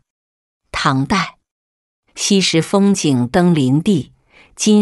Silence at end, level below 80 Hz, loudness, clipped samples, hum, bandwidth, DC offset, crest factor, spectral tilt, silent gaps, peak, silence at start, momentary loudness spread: 0 s; -46 dBFS; -15 LUFS; under 0.1%; none; 12 kHz; under 0.1%; 14 dB; -5 dB/octave; 1.51-2.03 s; -2 dBFS; 0.75 s; 7 LU